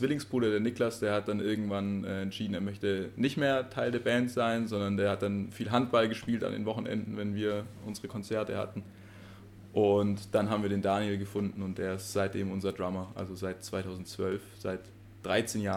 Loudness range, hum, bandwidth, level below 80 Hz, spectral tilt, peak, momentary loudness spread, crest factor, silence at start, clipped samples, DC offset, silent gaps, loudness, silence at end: 5 LU; none; 16 kHz; -64 dBFS; -6 dB/octave; -14 dBFS; 11 LU; 18 dB; 0 s; under 0.1%; under 0.1%; none; -32 LUFS; 0 s